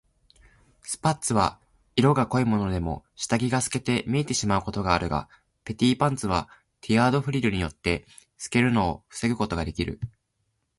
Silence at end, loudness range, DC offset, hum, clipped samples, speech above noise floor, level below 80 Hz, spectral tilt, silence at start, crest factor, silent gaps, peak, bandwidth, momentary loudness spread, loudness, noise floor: 0.7 s; 2 LU; under 0.1%; none; under 0.1%; 50 dB; -44 dBFS; -5 dB/octave; 0.85 s; 20 dB; none; -6 dBFS; 11.5 kHz; 11 LU; -25 LUFS; -75 dBFS